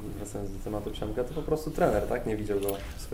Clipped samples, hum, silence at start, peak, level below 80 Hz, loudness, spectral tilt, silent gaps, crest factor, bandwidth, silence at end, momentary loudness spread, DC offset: under 0.1%; none; 0 s; -10 dBFS; -40 dBFS; -31 LUFS; -6 dB/octave; none; 20 dB; 16 kHz; 0 s; 11 LU; under 0.1%